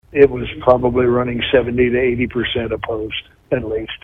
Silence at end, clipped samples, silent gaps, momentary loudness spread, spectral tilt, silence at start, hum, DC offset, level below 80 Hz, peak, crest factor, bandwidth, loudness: 0.1 s; under 0.1%; none; 9 LU; -8.5 dB/octave; 0.15 s; none; under 0.1%; -38 dBFS; 0 dBFS; 16 dB; 4.4 kHz; -17 LUFS